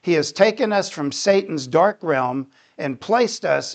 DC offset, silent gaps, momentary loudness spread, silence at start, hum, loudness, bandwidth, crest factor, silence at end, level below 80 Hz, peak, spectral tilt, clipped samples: under 0.1%; none; 11 LU; 0.05 s; none; -20 LUFS; 9 kHz; 18 dB; 0 s; -70 dBFS; -2 dBFS; -4.5 dB/octave; under 0.1%